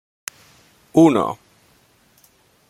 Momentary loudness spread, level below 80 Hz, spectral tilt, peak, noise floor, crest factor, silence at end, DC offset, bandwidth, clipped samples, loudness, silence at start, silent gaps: 21 LU; -62 dBFS; -6.5 dB/octave; 0 dBFS; -57 dBFS; 20 dB; 1.35 s; under 0.1%; 15.5 kHz; under 0.1%; -17 LUFS; 0.95 s; none